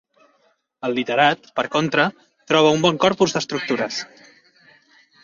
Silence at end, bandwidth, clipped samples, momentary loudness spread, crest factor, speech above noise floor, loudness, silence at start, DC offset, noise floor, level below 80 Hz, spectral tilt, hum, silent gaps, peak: 1.2 s; 7.6 kHz; under 0.1%; 10 LU; 20 dB; 44 dB; -20 LUFS; 0.85 s; under 0.1%; -64 dBFS; -62 dBFS; -4 dB/octave; none; none; -2 dBFS